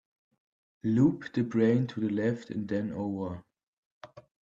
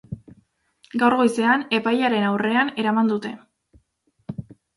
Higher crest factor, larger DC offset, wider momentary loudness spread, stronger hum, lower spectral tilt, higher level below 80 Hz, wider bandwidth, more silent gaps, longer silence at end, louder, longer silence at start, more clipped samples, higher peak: about the same, 18 dB vs 18 dB; neither; second, 11 LU vs 20 LU; neither; first, -9 dB/octave vs -5.5 dB/octave; second, -68 dBFS vs -60 dBFS; second, 7.6 kHz vs 11.5 kHz; first, 3.63-4.01 s vs none; second, 0.2 s vs 0.35 s; second, -30 LUFS vs -20 LUFS; first, 0.85 s vs 0.1 s; neither; second, -12 dBFS vs -6 dBFS